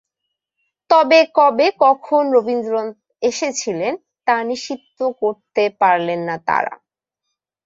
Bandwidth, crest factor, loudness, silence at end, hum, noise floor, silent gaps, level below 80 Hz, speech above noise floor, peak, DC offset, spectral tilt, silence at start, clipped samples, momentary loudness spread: 7.8 kHz; 16 dB; -17 LUFS; 0.9 s; none; -79 dBFS; none; -68 dBFS; 62 dB; -2 dBFS; under 0.1%; -3.5 dB/octave; 0.9 s; under 0.1%; 11 LU